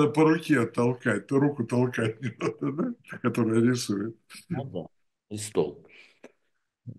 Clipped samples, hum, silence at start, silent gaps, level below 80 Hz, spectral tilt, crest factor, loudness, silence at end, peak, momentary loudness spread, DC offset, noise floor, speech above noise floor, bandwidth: under 0.1%; none; 0 s; none; -70 dBFS; -6.5 dB/octave; 18 dB; -27 LUFS; 0.05 s; -10 dBFS; 14 LU; under 0.1%; -78 dBFS; 51 dB; 12.5 kHz